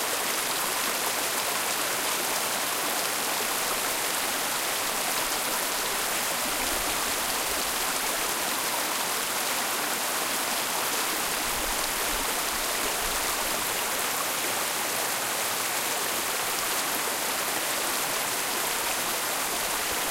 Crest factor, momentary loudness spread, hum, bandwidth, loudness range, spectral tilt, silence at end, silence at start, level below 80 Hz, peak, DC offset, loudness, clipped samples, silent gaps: 18 dB; 1 LU; none; 17 kHz; 0 LU; 0 dB/octave; 0 s; 0 s; -52 dBFS; -10 dBFS; under 0.1%; -26 LUFS; under 0.1%; none